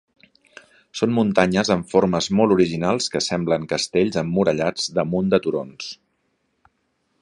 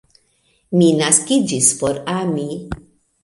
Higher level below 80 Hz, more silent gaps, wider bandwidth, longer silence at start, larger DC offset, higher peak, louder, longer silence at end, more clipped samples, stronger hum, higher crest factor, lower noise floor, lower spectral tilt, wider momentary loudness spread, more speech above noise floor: second, -52 dBFS vs -46 dBFS; neither; about the same, 11 kHz vs 11.5 kHz; first, 0.95 s vs 0.7 s; neither; about the same, 0 dBFS vs 0 dBFS; second, -20 LUFS vs -16 LUFS; first, 1.3 s vs 0.5 s; neither; neither; about the same, 20 dB vs 18 dB; first, -70 dBFS vs -61 dBFS; about the same, -5 dB/octave vs -4 dB/octave; second, 10 LU vs 15 LU; first, 50 dB vs 45 dB